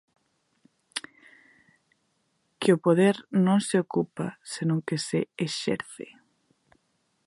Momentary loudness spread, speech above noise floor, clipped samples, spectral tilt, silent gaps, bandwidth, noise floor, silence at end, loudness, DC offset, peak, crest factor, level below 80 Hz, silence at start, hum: 15 LU; 48 dB; under 0.1%; -6 dB/octave; none; 11.5 kHz; -73 dBFS; 1.25 s; -26 LUFS; under 0.1%; -8 dBFS; 20 dB; -72 dBFS; 0.95 s; none